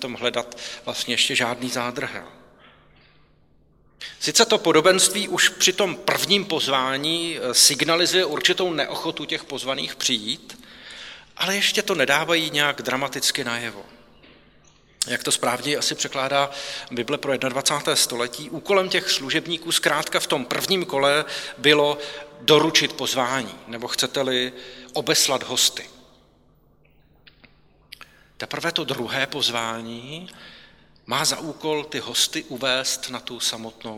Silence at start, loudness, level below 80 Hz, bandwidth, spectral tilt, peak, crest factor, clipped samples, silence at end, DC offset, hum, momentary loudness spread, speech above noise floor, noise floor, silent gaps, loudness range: 0 s; -21 LUFS; -62 dBFS; 17.5 kHz; -1.5 dB/octave; -2 dBFS; 22 dB; under 0.1%; 0 s; under 0.1%; none; 15 LU; 35 dB; -58 dBFS; none; 8 LU